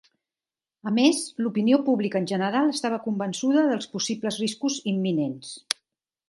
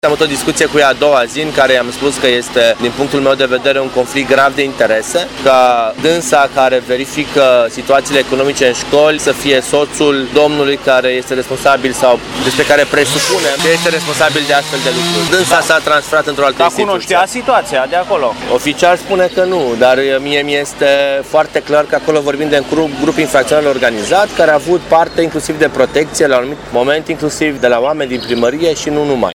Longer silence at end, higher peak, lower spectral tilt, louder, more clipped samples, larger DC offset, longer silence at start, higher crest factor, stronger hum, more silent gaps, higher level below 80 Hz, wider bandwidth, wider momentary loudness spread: first, 0.55 s vs 0 s; about the same, 0 dBFS vs 0 dBFS; about the same, -4.5 dB/octave vs -3.5 dB/octave; second, -25 LUFS vs -11 LUFS; second, under 0.1% vs 0.1%; neither; first, 0.85 s vs 0.05 s; first, 24 dB vs 12 dB; neither; neither; second, -76 dBFS vs -42 dBFS; second, 11.5 kHz vs 17.5 kHz; first, 9 LU vs 5 LU